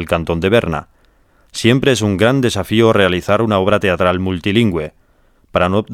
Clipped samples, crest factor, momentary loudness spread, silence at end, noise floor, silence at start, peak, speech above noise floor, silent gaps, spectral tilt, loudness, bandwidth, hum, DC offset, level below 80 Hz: under 0.1%; 16 dB; 9 LU; 0 s; -53 dBFS; 0 s; 0 dBFS; 39 dB; none; -5.5 dB/octave; -15 LUFS; 16 kHz; none; under 0.1%; -40 dBFS